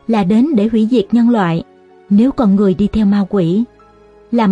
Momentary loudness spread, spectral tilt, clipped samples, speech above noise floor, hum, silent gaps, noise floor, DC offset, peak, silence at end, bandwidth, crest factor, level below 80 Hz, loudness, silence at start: 6 LU; -9 dB/octave; under 0.1%; 32 dB; none; none; -44 dBFS; under 0.1%; -2 dBFS; 0 s; 8 kHz; 12 dB; -40 dBFS; -13 LUFS; 0.1 s